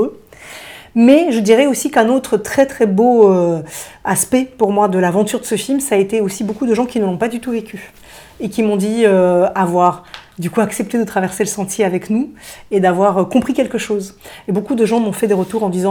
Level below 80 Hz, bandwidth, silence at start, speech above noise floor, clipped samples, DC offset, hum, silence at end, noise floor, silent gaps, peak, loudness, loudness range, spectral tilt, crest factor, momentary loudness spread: -52 dBFS; over 20 kHz; 0 s; 22 dB; under 0.1%; under 0.1%; none; 0 s; -36 dBFS; none; 0 dBFS; -15 LUFS; 5 LU; -5.5 dB/octave; 14 dB; 13 LU